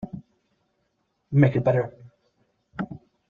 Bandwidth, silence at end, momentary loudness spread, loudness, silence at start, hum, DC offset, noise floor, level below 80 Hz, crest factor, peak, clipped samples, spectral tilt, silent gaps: 4 kHz; 0.3 s; 21 LU; -24 LUFS; 0 s; none; under 0.1%; -73 dBFS; -58 dBFS; 22 dB; -6 dBFS; under 0.1%; -10.5 dB/octave; none